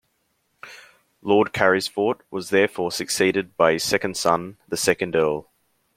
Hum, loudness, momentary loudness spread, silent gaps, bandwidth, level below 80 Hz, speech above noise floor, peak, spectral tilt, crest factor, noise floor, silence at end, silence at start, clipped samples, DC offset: none; -22 LUFS; 12 LU; none; 16.5 kHz; -60 dBFS; 49 dB; -2 dBFS; -3.5 dB/octave; 22 dB; -70 dBFS; 0.55 s; 0.65 s; under 0.1%; under 0.1%